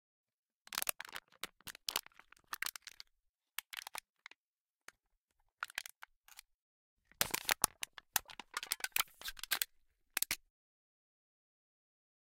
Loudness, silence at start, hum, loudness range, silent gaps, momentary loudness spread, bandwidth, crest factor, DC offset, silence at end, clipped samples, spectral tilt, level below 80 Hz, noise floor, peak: -40 LUFS; 0.7 s; none; 12 LU; 3.29-3.34 s, 4.10-4.14 s, 4.36-4.54 s, 4.60-4.79 s, 5.18-5.28 s, 5.97-6.01 s, 6.16-6.24 s, 6.54-6.97 s; 22 LU; 17 kHz; 40 dB; under 0.1%; 1.95 s; under 0.1%; 1 dB/octave; -70 dBFS; under -90 dBFS; -6 dBFS